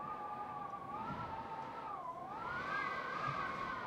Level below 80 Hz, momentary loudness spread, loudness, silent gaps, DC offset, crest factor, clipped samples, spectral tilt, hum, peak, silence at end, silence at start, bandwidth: -68 dBFS; 6 LU; -43 LUFS; none; under 0.1%; 16 dB; under 0.1%; -5.5 dB/octave; none; -26 dBFS; 0 s; 0 s; 16 kHz